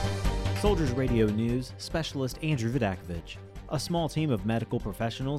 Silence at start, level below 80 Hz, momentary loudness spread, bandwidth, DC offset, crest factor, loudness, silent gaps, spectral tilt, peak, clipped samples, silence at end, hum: 0 s; -38 dBFS; 10 LU; 15.5 kHz; under 0.1%; 16 dB; -30 LUFS; none; -6.5 dB/octave; -12 dBFS; under 0.1%; 0 s; none